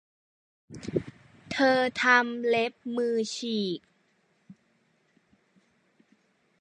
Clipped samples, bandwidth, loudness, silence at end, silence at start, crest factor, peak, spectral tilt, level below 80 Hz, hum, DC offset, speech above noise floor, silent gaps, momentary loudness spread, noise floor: under 0.1%; 10.5 kHz; -27 LUFS; 2.8 s; 0.7 s; 22 dB; -8 dBFS; -4 dB/octave; -66 dBFS; none; under 0.1%; 43 dB; none; 17 LU; -69 dBFS